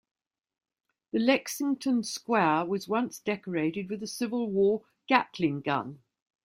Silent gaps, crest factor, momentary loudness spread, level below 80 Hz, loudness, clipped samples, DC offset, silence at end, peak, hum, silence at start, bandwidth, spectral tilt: none; 22 dB; 8 LU; -72 dBFS; -29 LUFS; under 0.1%; under 0.1%; 0.5 s; -8 dBFS; none; 1.15 s; 16 kHz; -5 dB/octave